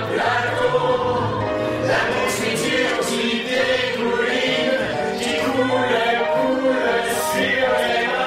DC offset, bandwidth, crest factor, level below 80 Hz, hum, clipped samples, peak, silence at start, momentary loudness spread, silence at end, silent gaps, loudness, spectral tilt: under 0.1%; 16 kHz; 14 dB; -50 dBFS; none; under 0.1%; -6 dBFS; 0 s; 3 LU; 0 s; none; -19 LUFS; -4 dB/octave